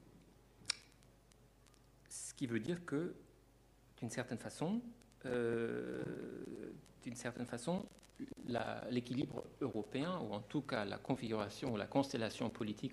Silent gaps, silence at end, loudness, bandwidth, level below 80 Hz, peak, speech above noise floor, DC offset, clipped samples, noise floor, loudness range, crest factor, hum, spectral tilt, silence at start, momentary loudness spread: none; 0 s; -43 LUFS; 15 kHz; -70 dBFS; -18 dBFS; 26 dB; under 0.1%; under 0.1%; -67 dBFS; 4 LU; 26 dB; none; -5.5 dB/octave; 0 s; 12 LU